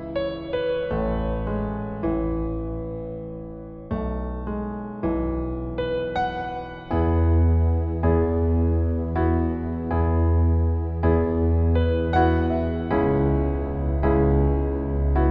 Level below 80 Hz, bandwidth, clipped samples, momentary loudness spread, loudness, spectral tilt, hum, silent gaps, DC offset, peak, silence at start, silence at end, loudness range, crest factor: -28 dBFS; 4.8 kHz; under 0.1%; 10 LU; -24 LUFS; -11 dB/octave; none; none; under 0.1%; -8 dBFS; 0 s; 0 s; 8 LU; 14 dB